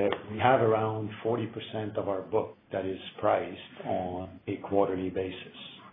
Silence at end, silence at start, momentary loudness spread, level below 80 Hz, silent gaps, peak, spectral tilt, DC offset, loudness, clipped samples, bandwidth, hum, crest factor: 0 s; 0 s; 13 LU; -66 dBFS; none; -10 dBFS; -10 dB/octave; under 0.1%; -31 LUFS; under 0.1%; 3.9 kHz; none; 22 dB